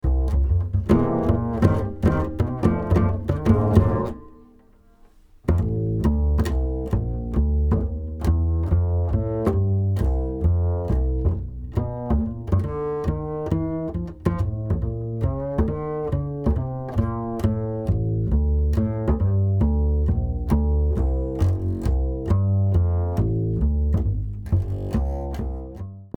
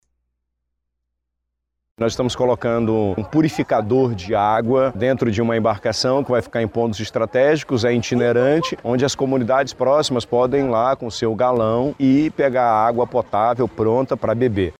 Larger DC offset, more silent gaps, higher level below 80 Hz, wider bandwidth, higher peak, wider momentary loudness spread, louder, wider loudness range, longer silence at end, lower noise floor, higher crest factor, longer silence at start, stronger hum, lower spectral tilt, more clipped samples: neither; neither; first, -26 dBFS vs -50 dBFS; second, 7.2 kHz vs 13 kHz; first, -2 dBFS vs -6 dBFS; about the same, 6 LU vs 4 LU; second, -23 LUFS vs -19 LUFS; about the same, 4 LU vs 2 LU; about the same, 0.1 s vs 0.1 s; second, -52 dBFS vs -78 dBFS; about the same, 18 dB vs 14 dB; second, 0.05 s vs 2 s; second, none vs 60 Hz at -45 dBFS; first, -10 dB/octave vs -6 dB/octave; neither